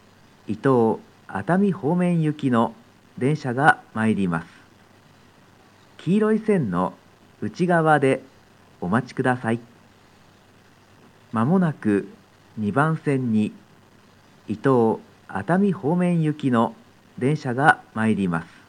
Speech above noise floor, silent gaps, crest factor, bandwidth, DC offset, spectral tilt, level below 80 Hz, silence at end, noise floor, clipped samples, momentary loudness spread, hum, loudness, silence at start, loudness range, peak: 32 dB; none; 22 dB; 11 kHz; under 0.1%; -8 dB/octave; -68 dBFS; 0.25 s; -53 dBFS; under 0.1%; 12 LU; none; -22 LUFS; 0.5 s; 4 LU; 0 dBFS